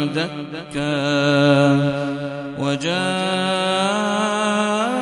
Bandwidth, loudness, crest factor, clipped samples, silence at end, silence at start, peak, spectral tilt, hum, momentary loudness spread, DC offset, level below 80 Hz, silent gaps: 11.5 kHz; -19 LUFS; 18 dB; under 0.1%; 0 s; 0 s; -2 dBFS; -5 dB/octave; none; 11 LU; under 0.1%; -58 dBFS; none